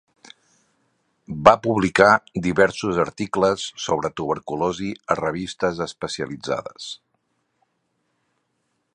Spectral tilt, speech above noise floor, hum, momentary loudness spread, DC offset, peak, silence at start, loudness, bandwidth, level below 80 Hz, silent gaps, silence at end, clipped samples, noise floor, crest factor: -5 dB/octave; 51 dB; none; 13 LU; under 0.1%; 0 dBFS; 1.3 s; -21 LUFS; 10.5 kHz; -52 dBFS; none; 2 s; under 0.1%; -72 dBFS; 22 dB